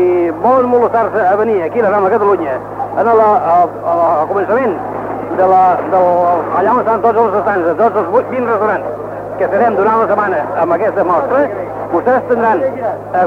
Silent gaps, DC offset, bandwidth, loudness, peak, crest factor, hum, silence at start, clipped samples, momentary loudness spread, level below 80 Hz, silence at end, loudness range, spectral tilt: none; under 0.1%; 6.8 kHz; -13 LUFS; 0 dBFS; 12 dB; none; 0 s; under 0.1%; 8 LU; -50 dBFS; 0 s; 2 LU; -8.5 dB/octave